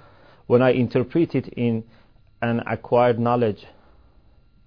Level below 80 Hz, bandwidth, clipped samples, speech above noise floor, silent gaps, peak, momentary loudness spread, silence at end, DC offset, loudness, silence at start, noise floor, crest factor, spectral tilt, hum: -56 dBFS; 5.4 kHz; under 0.1%; 35 dB; none; -6 dBFS; 8 LU; 1.1 s; 0.2%; -22 LUFS; 0.5 s; -55 dBFS; 18 dB; -10 dB/octave; none